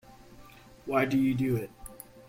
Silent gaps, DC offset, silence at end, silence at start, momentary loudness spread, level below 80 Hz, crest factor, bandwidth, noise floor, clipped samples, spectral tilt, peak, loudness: none; under 0.1%; 0.05 s; 0.1 s; 20 LU; -56 dBFS; 18 dB; 16.5 kHz; -52 dBFS; under 0.1%; -7 dB/octave; -14 dBFS; -28 LUFS